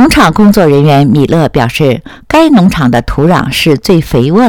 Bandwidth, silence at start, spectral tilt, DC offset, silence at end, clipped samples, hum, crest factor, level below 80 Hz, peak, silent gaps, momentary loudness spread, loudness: 18.5 kHz; 0 s; -6.5 dB/octave; 0.7%; 0 s; 4%; none; 6 dB; -26 dBFS; 0 dBFS; none; 5 LU; -7 LUFS